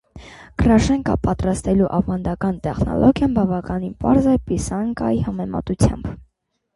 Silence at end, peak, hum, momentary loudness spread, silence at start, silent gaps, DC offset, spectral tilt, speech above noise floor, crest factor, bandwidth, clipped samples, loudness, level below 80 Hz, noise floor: 0.55 s; -2 dBFS; none; 9 LU; 0.15 s; none; under 0.1%; -7 dB/octave; 50 dB; 16 dB; 11.5 kHz; under 0.1%; -19 LUFS; -32 dBFS; -68 dBFS